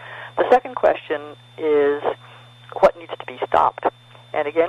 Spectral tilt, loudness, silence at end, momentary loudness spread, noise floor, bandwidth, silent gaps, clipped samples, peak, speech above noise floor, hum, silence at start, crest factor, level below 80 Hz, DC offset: -6 dB/octave; -20 LUFS; 0 s; 16 LU; -44 dBFS; 11.5 kHz; none; under 0.1%; -2 dBFS; 25 dB; none; 0 s; 18 dB; -56 dBFS; under 0.1%